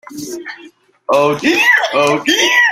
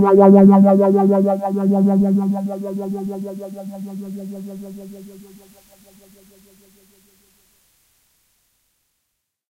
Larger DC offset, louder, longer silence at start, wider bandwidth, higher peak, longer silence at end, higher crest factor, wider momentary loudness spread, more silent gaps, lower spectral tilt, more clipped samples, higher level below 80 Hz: neither; first, -11 LUFS vs -15 LUFS; about the same, 0.1 s vs 0 s; first, 16.5 kHz vs 3.3 kHz; about the same, 0 dBFS vs 0 dBFS; second, 0 s vs 4.4 s; about the same, 14 dB vs 18 dB; second, 18 LU vs 24 LU; neither; second, -2.5 dB/octave vs -10 dB/octave; neither; first, -58 dBFS vs -64 dBFS